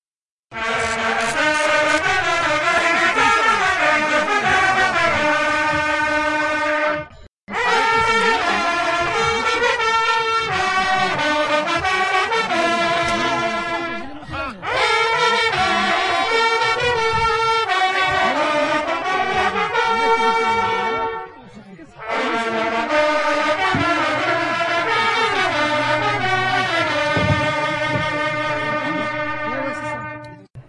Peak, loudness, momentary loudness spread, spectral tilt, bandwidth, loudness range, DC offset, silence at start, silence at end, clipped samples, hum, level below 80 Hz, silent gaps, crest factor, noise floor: -4 dBFS; -18 LUFS; 7 LU; -3.5 dB/octave; 11.5 kHz; 4 LU; under 0.1%; 0.5 s; 0.05 s; under 0.1%; none; -48 dBFS; 7.28-7.47 s; 16 dB; under -90 dBFS